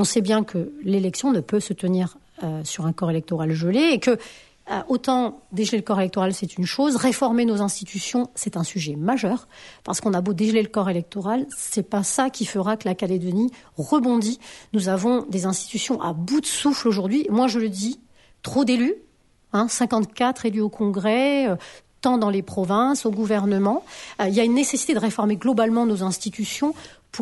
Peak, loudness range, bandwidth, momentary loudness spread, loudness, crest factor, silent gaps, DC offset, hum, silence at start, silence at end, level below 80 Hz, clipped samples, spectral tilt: -6 dBFS; 2 LU; 11.5 kHz; 8 LU; -23 LUFS; 16 dB; none; under 0.1%; none; 0 s; 0 s; -62 dBFS; under 0.1%; -5 dB/octave